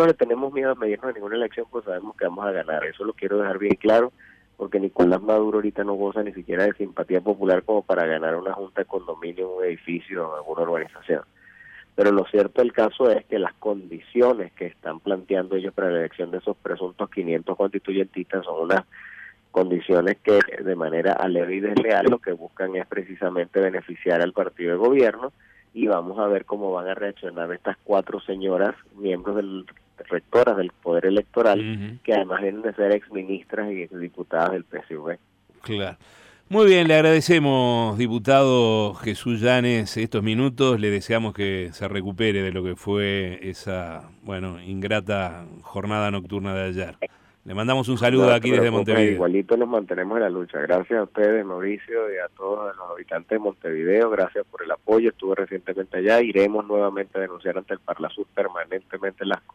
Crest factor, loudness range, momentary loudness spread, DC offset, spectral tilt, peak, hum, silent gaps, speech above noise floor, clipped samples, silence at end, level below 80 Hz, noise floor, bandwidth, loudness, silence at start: 16 dB; 7 LU; 12 LU; under 0.1%; -6.5 dB/octave; -6 dBFS; none; none; 25 dB; under 0.1%; 0.15 s; -60 dBFS; -48 dBFS; 13 kHz; -23 LUFS; 0 s